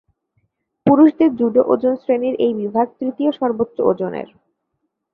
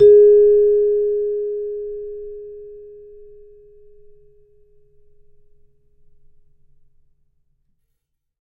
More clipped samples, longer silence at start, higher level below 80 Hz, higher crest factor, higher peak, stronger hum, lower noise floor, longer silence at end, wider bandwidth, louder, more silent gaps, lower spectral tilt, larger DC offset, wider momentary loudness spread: neither; first, 0.85 s vs 0 s; second, -60 dBFS vs -50 dBFS; about the same, 16 dB vs 16 dB; about the same, -2 dBFS vs -4 dBFS; neither; about the same, -74 dBFS vs -73 dBFS; second, 0.9 s vs 5.6 s; first, 4.3 kHz vs 3.8 kHz; about the same, -17 LUFS vs -15 LUFS; neither; about the same, -10.5 dB/octave vs -9.5 dB/octave; neither; second, 10 LU vs 27 LU